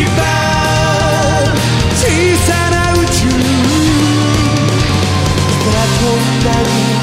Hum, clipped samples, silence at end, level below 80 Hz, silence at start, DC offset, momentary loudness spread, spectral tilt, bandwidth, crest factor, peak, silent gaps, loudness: none; under 0.1%; 0 s; -24 dBFS; 0 s; 0.3%; 2 LU; -4.5 dB/octave; 16 kHz; 12 dB; 0 dBFS; none; -12 LUFS